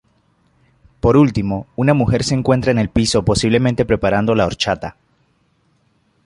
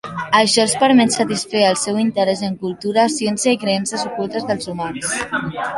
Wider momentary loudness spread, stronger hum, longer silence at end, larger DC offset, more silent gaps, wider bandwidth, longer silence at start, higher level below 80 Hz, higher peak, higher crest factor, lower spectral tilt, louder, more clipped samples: second, 6 LU vs 10 LU; neither; first, 1.35 s vs 0 s; neither; neither; about the same, 11.5 kHz vs 11.5 kHz; first, 1.05 s vs 0.05 s; first, -36 dBFS vs -56 dBFS; about the same, -2 dBFS vs -2 dBFS; about the same, 16 dB vs 16 dB; first, -6 dB/octave vs -3.5 dB/octave; about the same, -16 LUFS vs -17 LUFS; neither